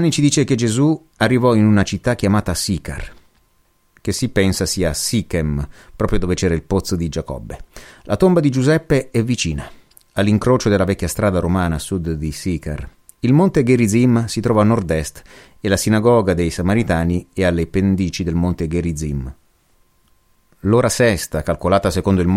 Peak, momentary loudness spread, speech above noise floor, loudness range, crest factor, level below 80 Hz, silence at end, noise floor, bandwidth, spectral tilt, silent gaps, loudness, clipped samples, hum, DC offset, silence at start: -2 dBFS; 12 LU; 42 dB; 4 LU; 16 dB; -34 dBFS; 0 s; -59 dBFS; 16 kHz; -6 dB/octave; none; -17 LUFS; under 0.1%; none; under 0.1%; 0 s